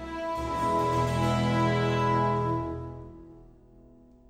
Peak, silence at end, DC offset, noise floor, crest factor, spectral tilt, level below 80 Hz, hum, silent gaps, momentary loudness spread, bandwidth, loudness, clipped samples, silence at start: -12 dBFS; 0.5 s; under 0.1%; -54 dBFS; 16 dB; -6.5 dB/octave; -46 dBFS; none; none; 13 LU; 13.5 kHz; -27 LUFS; under 0.1%; 0 s